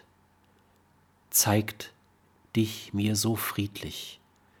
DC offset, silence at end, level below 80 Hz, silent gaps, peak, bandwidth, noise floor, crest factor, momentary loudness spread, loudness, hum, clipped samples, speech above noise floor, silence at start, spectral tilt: under 0.1%; 0.45 s; -62 dBFS; none; -10 dBFS; 19 kHz; -64 dBFS; 22 dB; 17 LU; -28 LUFS; none; under 0.1%; 35 dB; 1.3 s; -4 dB/octave